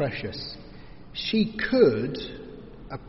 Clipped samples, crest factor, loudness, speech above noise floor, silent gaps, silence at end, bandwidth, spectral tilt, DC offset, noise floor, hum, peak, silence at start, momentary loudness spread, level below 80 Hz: under 0.1%; 20 dB; -25 LUFS; 20 dB; none; 0 s; 6 kHz; -4.5 dB/octave; under 0.1%; -45 dBFS; none; -6 dBFS; 0 s; 23 LU; -48 dBFS